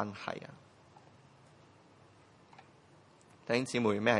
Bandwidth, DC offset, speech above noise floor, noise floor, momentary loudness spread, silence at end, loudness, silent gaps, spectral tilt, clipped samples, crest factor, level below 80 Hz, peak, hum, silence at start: 11 kHz; under 0.1%; 29 dB; -62 dBFS; 28 LU; 0 s; -34 LUFS; none; -5 dB/octave; under 0.1%; 26 dB; -78 dBFS; -12 dBFS; none; 0 s